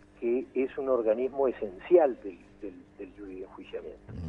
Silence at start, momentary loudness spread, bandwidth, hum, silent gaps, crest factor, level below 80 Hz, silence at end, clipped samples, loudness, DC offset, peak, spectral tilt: 0.2 s; 21 LU; 3.9 kHz; 50 Hz at -60 dBFS; none; 20 dB; -58 dBFS; 0 s; under 0.1%; -28 LUFS; under 0.1%; -10 dBFS; -9 dB/octave